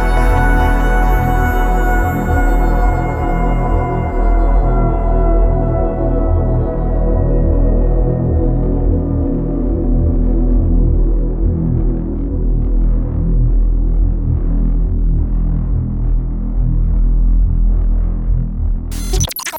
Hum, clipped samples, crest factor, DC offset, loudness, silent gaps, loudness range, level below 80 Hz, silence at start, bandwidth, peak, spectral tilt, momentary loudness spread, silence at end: none; under 0.1%; 12 dB; under 0.1%; -17 LUFS; none; 2 LU; -14 dBFS; 0 s; 12.5 kHz; -2 dBFS; -7 dB/octave; 4 LU; 0 s